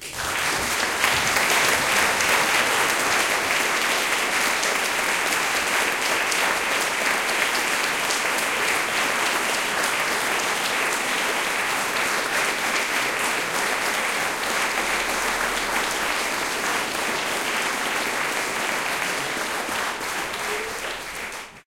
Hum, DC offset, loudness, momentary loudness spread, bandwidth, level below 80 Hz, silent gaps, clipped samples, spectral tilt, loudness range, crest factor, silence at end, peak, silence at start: none; 0.1%; -22 LUFS; 6 LU; 17 kHz; -54 dBFS; none; under 0.1%; -0.5 dB/octave; 4 LU; 20 dB; 0.05 s; -4 dBFS; 0 s